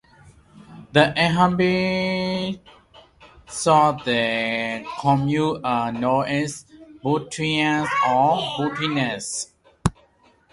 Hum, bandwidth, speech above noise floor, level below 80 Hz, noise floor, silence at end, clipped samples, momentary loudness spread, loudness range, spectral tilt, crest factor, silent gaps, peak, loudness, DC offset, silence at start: none; 11.5 kHz; 37 dB; -50 dBFS; -58 dBFS; 0.6 s; under 0.1%; 10 LU; 2 LU; -5 dB/octave; 22 dB; none; 0 dBFS; -21 LUFS; under 0.1%; 0.25 s